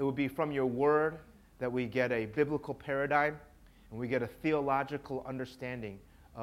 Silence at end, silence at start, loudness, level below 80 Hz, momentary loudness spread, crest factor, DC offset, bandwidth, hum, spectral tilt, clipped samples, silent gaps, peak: 0 s; 0 s; -33 LUFS; -60 dBFS; 14 LU; 20 dB; under 0.1%; 15.5 kHz; none; -7.5 dB/octave; under 0.1%; none; -14 dBFS